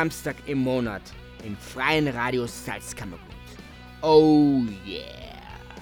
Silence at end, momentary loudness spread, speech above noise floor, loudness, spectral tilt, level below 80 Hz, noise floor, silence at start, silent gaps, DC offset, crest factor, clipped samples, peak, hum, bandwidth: 0 s; 25 LU; 20 dB; -23 LUFS; -5.5 dB/octave; -48 dBFS; -44 dBFS; 0 s; none; under 0.1%; 20 dB; under 0.1%; -4 dBFS; none; 18 kHz